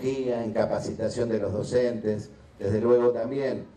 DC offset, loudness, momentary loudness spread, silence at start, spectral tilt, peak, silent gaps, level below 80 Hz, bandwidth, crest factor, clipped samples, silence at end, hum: under 0.1%; -27 LUFS; 9 LU; 0 s; -7 dB/octave; -10 dBFS; none; -58 dBFS; 10 kHz; 16 dB; under 0.1%; 0.05 s; none